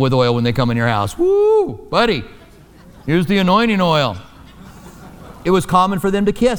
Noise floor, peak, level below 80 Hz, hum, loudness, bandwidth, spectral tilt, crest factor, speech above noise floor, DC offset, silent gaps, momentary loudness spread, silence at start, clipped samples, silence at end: -43 dBFS; -2 dBFS; -40 dBFS; none; -16 LUFS; 20 kHz; -6.5 dB/octave; 16 dB; 28 dB; under 0.1%; none; 7 LU; 0 s; under 0.1%; 0 s